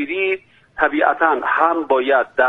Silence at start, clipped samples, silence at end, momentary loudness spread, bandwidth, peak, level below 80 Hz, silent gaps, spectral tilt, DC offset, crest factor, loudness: 0 s; under 0.1%; 0 s; 6 LU; 4.1 kHz; 0 dBFS; -56 dBFS; none; -5.5 dB/octave; under 0.1%; 18 dB; -17 LUFS